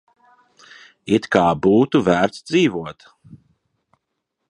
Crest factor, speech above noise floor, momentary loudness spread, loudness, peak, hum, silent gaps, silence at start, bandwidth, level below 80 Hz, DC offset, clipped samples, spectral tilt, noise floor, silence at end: 20 dB; 59 dB; 14 LU; -18 LUFS; 0 dBFS; none; none; 1.05 s; 11 kHz; -52 dBFS; under 0.1%; under 0.1%; -6 dB/octave; -77 dBFS; 1.55 s